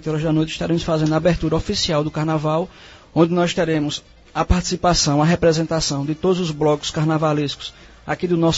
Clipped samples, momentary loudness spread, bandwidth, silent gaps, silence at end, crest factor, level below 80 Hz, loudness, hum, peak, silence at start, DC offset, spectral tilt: under 0.1%; 9 LU; 8 kHz; none; 0 s; 18 dB; -34 dBFS; -19 LUFS; none; -2 dBFS; 0 s; under 0.1%; -5 dB/octave